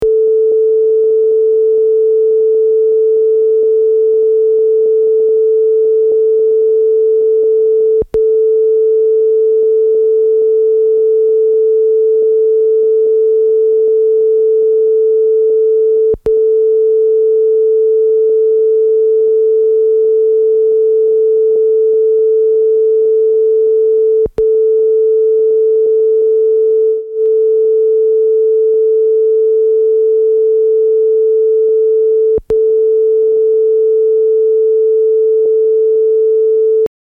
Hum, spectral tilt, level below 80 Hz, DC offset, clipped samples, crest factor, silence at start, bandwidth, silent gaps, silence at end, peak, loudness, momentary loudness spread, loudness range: none; -9 dB/octave; -48 dBFS; under 0.1%; under 0.1%; 4 dB; 0 s; 1.4 kHz; none; 0.15 s; -6 dBFS; -11 LUFS; 0 LU; 0 LU